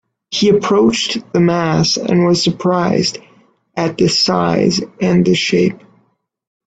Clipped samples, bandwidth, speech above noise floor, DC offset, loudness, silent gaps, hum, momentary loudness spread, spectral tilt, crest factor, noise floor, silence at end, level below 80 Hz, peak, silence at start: under 0.1%; 9 kHz; 47 dB; under 0.1%; -14 LUFS; none; none; 7 LU; -5 dB/octave; 14 dB; -61 dBFS; 0.9 s; -50 dBFS; 0 dBFS; 0.3 s